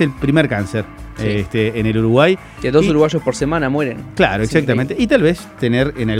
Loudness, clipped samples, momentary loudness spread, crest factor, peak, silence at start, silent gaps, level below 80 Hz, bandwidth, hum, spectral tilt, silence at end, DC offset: -16 LUFS; under 0.1%; 7 LU; 16 dB; 0 dBFS; 0 s; none; -36 dBFS; 15.5 kHz; none; -6.5 dB/octave; 0 s; under 0.1%